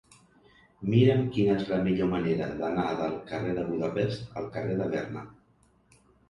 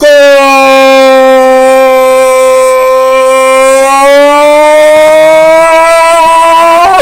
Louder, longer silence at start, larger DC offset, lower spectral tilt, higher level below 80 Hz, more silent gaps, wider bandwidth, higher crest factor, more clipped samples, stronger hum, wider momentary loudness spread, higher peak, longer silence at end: second, -28 LUFS vs -3 LUFS; first, 0.8 s vs 0 s; neither; first, -8.5 dB/octave vs -2 dB/octave; second, -56 dBFS vs -38 dBFS; neither; second, 10.5 kHz vs 16.5 kHz; first, 20 dB vs 2 dB; second, under 0.1% vs 20%; neither; first, 13 LU vs 2 LU; second, -10 dBFS vs 0 dBFS; first, 0.95 s vs 0 s